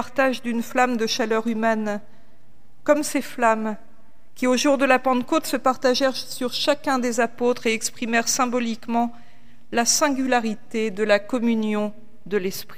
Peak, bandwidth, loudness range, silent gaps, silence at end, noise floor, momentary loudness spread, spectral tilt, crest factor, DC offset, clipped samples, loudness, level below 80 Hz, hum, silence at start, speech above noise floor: -4 dBFS; 16 kHz; 3 LU; none; 0.05 s; -57 dBFS; 8 LU; -3 dB/octave; 18 dB; 2%; under 0.1%; -22 LUFS; -62 dBFS; none; 0 s; 35 dB